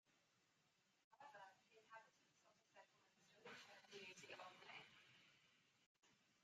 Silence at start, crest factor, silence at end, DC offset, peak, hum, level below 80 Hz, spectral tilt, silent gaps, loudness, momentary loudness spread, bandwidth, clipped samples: 0.05 s; 22 dB; 0 s; under 0.1%; -44 dBFS; none; under -90 dBFS; -2 dB/octave; 1.04-1.11 s, 5.86-5.95 s; -63 LUFS; 8 LU; 8.8 kHz; under 0.1%